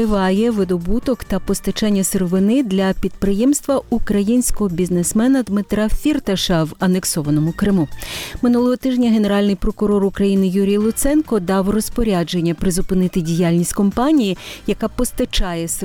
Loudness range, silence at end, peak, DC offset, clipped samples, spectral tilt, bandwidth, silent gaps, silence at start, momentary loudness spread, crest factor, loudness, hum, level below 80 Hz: 1 LU; 0 s; -6 dBFS; under 0.1%; under 0.1%; -5.5 dB/octave; 18.5 kHz; none; 0 s; 5 LU; 10 dB; -18 LUFS; none; -30 dBFS